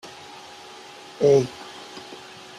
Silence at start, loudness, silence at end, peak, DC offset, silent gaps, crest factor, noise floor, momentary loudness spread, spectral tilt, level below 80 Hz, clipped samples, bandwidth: 0.05 s; -21 LUFS; 0.45 s; -6 dBFS; under 0.1%; none; 20 dB; -43 dBFS; 23 LU; -5.5 dB/octave; -64 dBFS; under 0.1%; 12 kHz